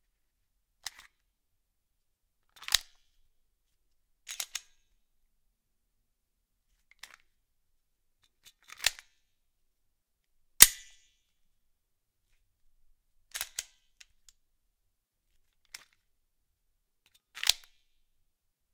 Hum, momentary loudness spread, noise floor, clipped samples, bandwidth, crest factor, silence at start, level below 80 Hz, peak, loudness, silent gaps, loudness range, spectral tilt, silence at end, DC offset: none; 26 LU; -80 dBFS; under 0.1%; 16.5 kHz; 38 dB; 2.7 s; -62 dBFS; 0 dBFS; -26 LUFS; none; 19 LU; 2 dB/octave; 1.2 s; under 0.1%